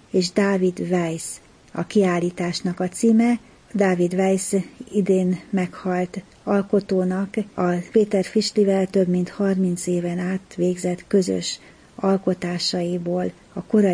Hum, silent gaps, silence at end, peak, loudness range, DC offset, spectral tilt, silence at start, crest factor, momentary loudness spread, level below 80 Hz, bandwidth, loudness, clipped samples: none; none; 0 s; -6 dBFS; 2 LU; under 0.1%; -6 dB/octave; 0.15 s; 16 dB; 8 LU; -58 dBFS; 10.5 kHz; -22 LUFS; under 0.1%